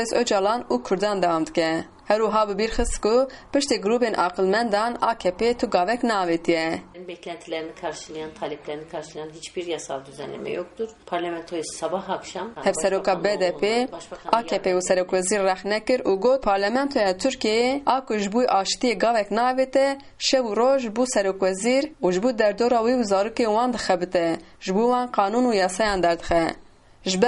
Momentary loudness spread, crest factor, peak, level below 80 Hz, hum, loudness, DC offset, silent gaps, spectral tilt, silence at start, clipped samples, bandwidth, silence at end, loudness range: 11 LU; 20 dB; -4 dBFS; -46 dBFS; none; -23 LUFS; under 0.1%; none; -4 dB/octave; 0 s; under 0.1%; 11.5 kHz; 0 s; 9 LU